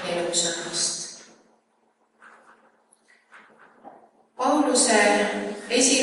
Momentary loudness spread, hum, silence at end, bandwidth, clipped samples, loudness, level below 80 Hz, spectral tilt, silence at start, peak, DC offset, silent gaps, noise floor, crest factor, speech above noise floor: 13 LU; none; 0 s; 11.5 kHz; under 0.1%; -22 LUFS; -70 dBFS; -1.5 dB/octave; 0 s; -6 dBFS; under 0.1%; none; -67 dBFS; 20 dB; 46 dB